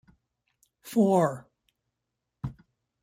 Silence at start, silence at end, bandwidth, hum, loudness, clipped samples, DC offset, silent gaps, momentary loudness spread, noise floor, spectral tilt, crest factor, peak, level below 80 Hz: 0.85 s; 0.5 s; 16 kHz; none; -25 LUFS; under 0.1%; under 0.1%; none; 18 LU; -84 dBFS; -7.5 dB/octave; 20 dB; -10 dBFS; -60 dBFS